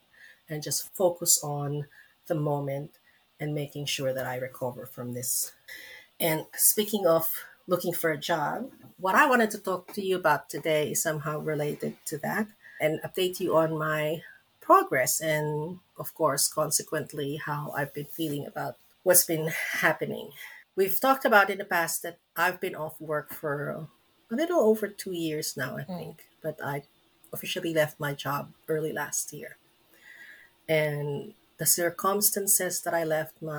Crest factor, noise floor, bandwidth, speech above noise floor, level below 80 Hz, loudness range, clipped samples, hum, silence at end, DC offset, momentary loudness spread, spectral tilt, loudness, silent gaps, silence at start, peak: 26 dB; -58 dBFS; over 20 kHz; 30 dB; -72 dBFS; 6 LU; under 0.1%; none; 0 s; under 0.1%; 16 LU; -3 dB/octave; -27 LUFS; none; 0.2 s; -4 dBFS